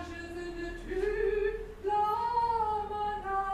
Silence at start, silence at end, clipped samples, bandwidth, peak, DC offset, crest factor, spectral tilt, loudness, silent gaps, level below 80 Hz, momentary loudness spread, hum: 0 s; 0 s; under 0.1%; 14 kHz; -20 dBFS; under 0.1%; 12 dB; -6 dB/octave; -32 LUFS; none; -46 dBFS; 11 LU; none